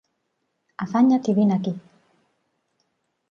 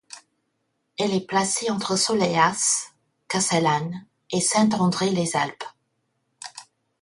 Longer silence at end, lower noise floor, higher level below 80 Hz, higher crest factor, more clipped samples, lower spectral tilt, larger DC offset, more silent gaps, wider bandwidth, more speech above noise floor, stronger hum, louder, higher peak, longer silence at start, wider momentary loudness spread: first, 1.5 s vs 0.4 s; about the same, -75 dBFS vs -74 dBFS; second, -72 dBFS vs -64 dBFS; about the same, 16 dB vs 20 dB; neither; first, -8 dB/octave vs -3.5 dB/octave; neither; neither; second, 7 kHz vs 11.5 kHz; about the same, 55 dB vs 52 dB; neither; about the same, -21 LUFS vs -22 LUFS; second, -8 dBFS vs -4 dBFS; first, 0.8 s vs 0.15 s; second, 15 LU vs 19 LU